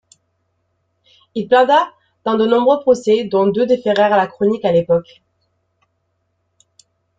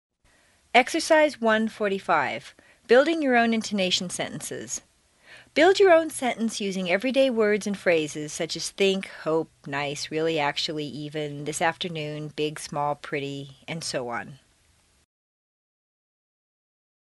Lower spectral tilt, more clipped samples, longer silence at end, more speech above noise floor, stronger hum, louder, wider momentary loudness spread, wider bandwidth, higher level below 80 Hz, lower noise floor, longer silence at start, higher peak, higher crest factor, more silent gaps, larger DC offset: first, -6 dB/octave vs -3.5 dB/octave; neither; second, 2.15 s vs 2.65 s; first, 54 dB vs 39 dB; neither; first, -15 LUFS vs -25 LUFS; second, 8 LU vs 13 LU; second, 7.8 kHz vs 11.5 kHz; first, -60 dBFS vs -66 dBFS; first, -68 dBFS vs -63 dBFS; first, 1.35 s vs 0.75 s; about the same, -2 dBFS vs -2 dBFS; second, 16 dB vs 24 dB; neither; neither